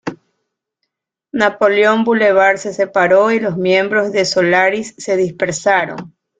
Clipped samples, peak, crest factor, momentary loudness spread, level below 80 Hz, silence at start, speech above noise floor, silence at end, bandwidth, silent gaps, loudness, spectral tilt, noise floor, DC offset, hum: under 0.1%; -2 dBFS; 14 dB; 8 LU; -58 dBFS; 0.05 s; 61 dB; 0.3 s; 9.4 kHz; none; -14 LUFS; -4.5 dB/octave; -74 dBFS; under 0.1%; none